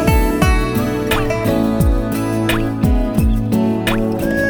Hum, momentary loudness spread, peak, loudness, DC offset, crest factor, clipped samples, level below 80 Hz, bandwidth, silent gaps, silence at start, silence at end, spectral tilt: none; 3 LU; -2 dBFS; -17 LUFS; under 0.1%; 14 dB; under 0.1%; -20 dBFS; over 20 kHz; none; 0 s; 0 s; -6.5 dB/octave